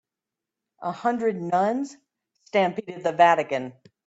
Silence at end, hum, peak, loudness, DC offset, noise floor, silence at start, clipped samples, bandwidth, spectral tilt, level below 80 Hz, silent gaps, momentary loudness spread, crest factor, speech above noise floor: 0.35 s; none; -4 dBFS; -24 LUFS; under 0.1%; -88 dBFS; 0.8 s; under 0.1%; 8 kHz; -5.5 dB/octave; -74 dBFS; none; 15 LU; 20 dB; 64 dB